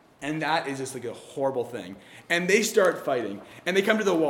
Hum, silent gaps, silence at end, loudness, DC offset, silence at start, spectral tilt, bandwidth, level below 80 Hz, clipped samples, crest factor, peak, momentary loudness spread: none; none; 0 s; -26 LUFS; under 0.1%; 0.2 s; -4 dB/octave; 18 kHz; -72 dBFS; under 0.1%; 20 dB; -6 dBFS; 15 LU